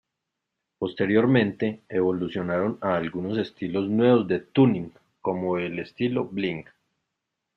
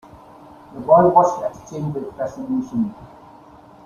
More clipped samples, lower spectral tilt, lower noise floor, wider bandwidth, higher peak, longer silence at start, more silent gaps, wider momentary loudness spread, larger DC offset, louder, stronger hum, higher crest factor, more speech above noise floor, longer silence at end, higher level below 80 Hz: neither; about the same, -9.5 dB/octave vs -8.5 dB/octave; first, -83 dBFS vs -45 dBFS; second, 5.8 kHz vs 7.2 kHz; second, -6 dBFS vs -2 dBFS; about the same, 0.8 s vs 0.7 s; neither; second, 12 LU vs 16 LU; neither; second, -25 LUFS vs -19 LUFS; neither; about the same, 20 dB vs 20 dB; first, 59 dB vs 26 dB; first, 0.95 s vs 0.8 s; second, -64 dBFS vs -54 dBFS